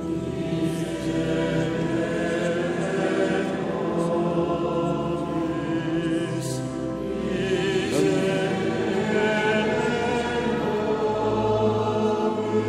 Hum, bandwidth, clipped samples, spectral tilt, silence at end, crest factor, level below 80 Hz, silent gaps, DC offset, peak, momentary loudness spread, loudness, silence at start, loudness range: none; 14 kHz; under 0.1%; -6 dB/octave; 0 s; 14 dB; -48 dBFS; none; under 0.1%; -10 dBFS; 5 LU; -24 LUFS; 0 s; 3 LU